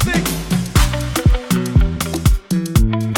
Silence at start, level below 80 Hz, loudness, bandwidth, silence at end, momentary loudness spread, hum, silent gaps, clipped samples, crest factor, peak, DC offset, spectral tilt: 0 s; -20 dBFS; -17 LUFS; 19 kHz; 0 s; 3 LU; none; none; under 0.1%; 14 dB; 0 dBFS; under 0.1%; -5 dB/octave